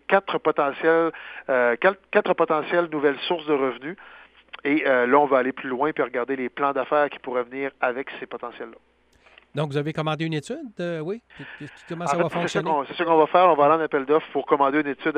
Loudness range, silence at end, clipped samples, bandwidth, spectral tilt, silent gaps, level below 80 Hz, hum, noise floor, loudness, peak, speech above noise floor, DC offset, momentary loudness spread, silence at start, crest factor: 8 LU; 0 s; under 0.1%; 9.6 kHz; -6 dB/octave; none; -68 dBFS; none; -57 dBFS; -23 LUFS; -4 dBFS; 35 dB; under 0.1%; 16 LU; 0.1 s; 20 dB